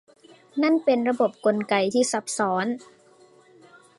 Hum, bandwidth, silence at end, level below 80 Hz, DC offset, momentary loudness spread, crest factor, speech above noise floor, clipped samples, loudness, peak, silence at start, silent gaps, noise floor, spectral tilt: none; 11.5 kHz; 1.15 s; -76 dBFS; under 0.1%; 7 LU; 18 dB; 32 dB; under 0.1%; -23 LUFS; -8 dBFS; 0.55 s; none; -55 dBFS; -4 dB/octave